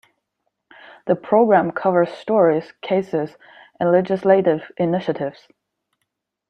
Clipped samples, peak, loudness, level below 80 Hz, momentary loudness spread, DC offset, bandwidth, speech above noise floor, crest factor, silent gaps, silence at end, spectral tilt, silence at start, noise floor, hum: under 0.1%; -2 dBFS; -19 LUFS; -66 dBFS; 9 LU; under 0.1%; 6.6 kHz; 58 dB; 18 dB; none; 1.2 s; -8.5 dB/octave; 1.05 s; -77 dBFS; none